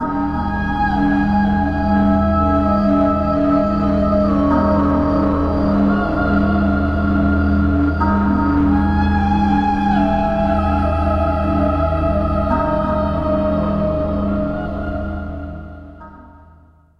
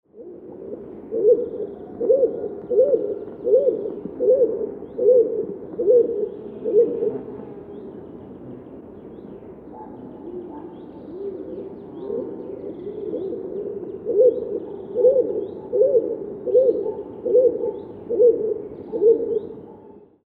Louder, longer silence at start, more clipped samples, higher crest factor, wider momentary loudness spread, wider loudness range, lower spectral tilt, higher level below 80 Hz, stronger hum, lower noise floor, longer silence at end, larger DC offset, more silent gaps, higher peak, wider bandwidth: first, -17 LUFS vs -21 LUFS; second, 0 s vs 0.15 s; neither; about the same, 12 dB vs 16 dB; second, 5 LU vs 21 LU; second, 4 LU vs 16 LU; second, -9.5 dB/octave vs -11.5 dB/octave; first, -26 dBFS vs -60 dBFS; neither; about the same, -48 dBFS vs -46 dBFS; first, 0.7 s vs 0.3 s; neither; neither; about the same, -4 dBFS vs -6 dBFS; first, 6 kHz vs 2.1 kHz